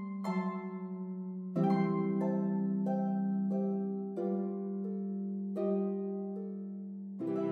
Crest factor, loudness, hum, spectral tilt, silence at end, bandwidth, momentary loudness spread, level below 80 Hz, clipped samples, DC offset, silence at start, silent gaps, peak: 14 dB; -35 LUFS; none; -10.5 dB/octave; 0 s; 4.5 kHz; 9 LU; -88 dBFS; under 0.1%; under 0.1%; 0 s; none; -20 dBFS